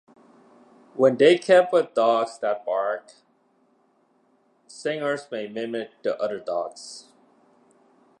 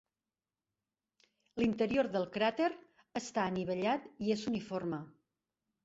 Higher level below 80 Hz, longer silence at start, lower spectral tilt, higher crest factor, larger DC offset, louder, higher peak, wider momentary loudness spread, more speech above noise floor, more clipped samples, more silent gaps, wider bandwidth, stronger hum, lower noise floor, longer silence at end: second, -82 dBFS vs -70 dBFS; second, 0.95 s vs 1.55 s; about the same, -5 dB/octave vs -4.5 dB/octave; about the same, 20 dB vs 18 dB; neither; first, -23 LUFS vs -35 LUFS; first, -4 dBFS vs -18 dBFS; first, 16 LU vs 11 LU; second, 42 dB vs over 56 dB; neither; neither; first, 9.8 kHz vs 8 kHz; neither; second, -64 dBFS vs under -90 dBFS; first, 1.2 s vs 0.75 s